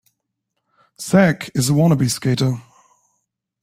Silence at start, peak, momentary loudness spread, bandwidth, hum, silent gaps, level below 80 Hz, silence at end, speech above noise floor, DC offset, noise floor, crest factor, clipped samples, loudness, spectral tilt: 1 s; -2 dBFS; 9 LU; 16 kHz; none; none; -54 dBFS; 1 s; 60 dB; under 0.1%; -76 dBFS; 18 dB; under 0.1%; -17 LUFS; -5.5 dB/octave